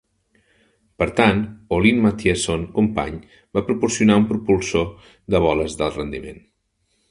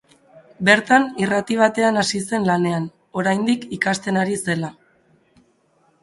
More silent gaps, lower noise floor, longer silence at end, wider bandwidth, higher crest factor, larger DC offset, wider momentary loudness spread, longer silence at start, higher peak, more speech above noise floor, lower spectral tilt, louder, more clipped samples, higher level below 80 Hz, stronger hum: neither; first, -69 dBFS vs -61 dBFS; second, 0.75 s vs 1.3 s; about the same, 11 kHz vs 11.5 kHz; about the same, 20 dB vs 20 dB; neither; first, 13 LU vs 8 LU; first, 1 s vs 0.35 s; about the same, 0 dBFS vs 0 dBFS; first, 49 dB vs 42 dB; about the same, -5.5 dB/octave vs -4.5 dB/octave; about the same, -20 LUFS vs -19 LUFS; neither; first, -40 dBFS vs -60 dBFS; neither